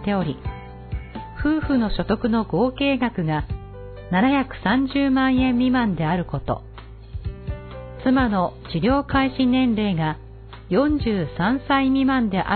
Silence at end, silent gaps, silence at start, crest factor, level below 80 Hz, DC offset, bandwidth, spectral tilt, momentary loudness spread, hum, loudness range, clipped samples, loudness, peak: 0 s; none; 0 s; 16 dB; -36 dBFS; under 0.1%; 4.5 kHz; -11 dB/octave; 15 LU; none; 2 LU; under 0.1%; -21 LUFS; -6 dBFS